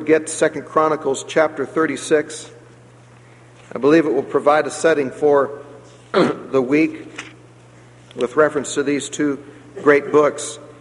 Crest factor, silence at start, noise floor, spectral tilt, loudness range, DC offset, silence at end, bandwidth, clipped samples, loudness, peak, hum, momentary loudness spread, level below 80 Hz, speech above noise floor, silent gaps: 20 dB; 0 s; -45 dBFS; -4.5 dB/octave; 3 LU; under 0.1%; 0.1 s; 11.5 kHz; under 0.1%; -18 LUFS; 0 dBFS; none; 17 LU; -62 dBFS; 28 dB; none